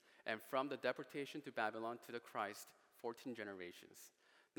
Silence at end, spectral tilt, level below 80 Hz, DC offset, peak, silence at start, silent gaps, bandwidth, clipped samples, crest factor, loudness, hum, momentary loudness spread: 0.5 s; -4 dB/octave; under -90 dBFS; under 0.1%; -24 dBFS; 0.05 s; none; 18 kHz; under 0.1%; 24 dB; -46 LUFS; none; 16 LU